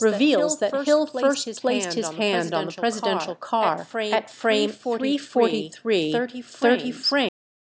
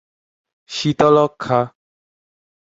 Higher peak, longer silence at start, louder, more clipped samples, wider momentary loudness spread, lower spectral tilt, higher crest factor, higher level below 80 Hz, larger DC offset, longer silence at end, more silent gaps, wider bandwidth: second, -6 dBFS vs -2 dBFS; second, 0 s vs 0.7 s; second, -23 LUFS vs -17 LUFS; neither; second, 6 LU vs 13 LU; second, -3.5 dB/octave vs -6 dB/octave; about the same, 16 dB vs 18 dB; second, -76 dBFS vs -56 dBFS; neither; second, 0.5 s vs 1 s; neither; about the same, 8 kHz vs 8 kHz